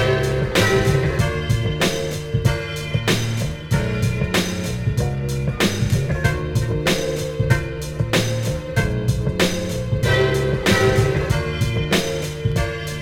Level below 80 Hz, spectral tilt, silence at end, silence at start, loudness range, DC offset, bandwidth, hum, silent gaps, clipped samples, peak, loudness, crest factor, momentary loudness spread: -32 dBFS; -5 dB/octave; 0 s; 0 s; 2 LU; under 0.1%; 17 kHz; none; none; under 0.1%; -2 dBFS; -20 LUFS; 16 dB; 7 LU